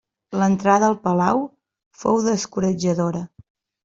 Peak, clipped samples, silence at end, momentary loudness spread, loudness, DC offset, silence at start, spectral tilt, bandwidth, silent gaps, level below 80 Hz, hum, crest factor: -2 dBFS; under 0.1%; 0.6 s; 13 LU; -20 LUFS; under 0.1%; 0.3 s; -6 dB/octave; 7.8 kHz; 1.86-1.91 s; -58 dBFS; none; 18 dB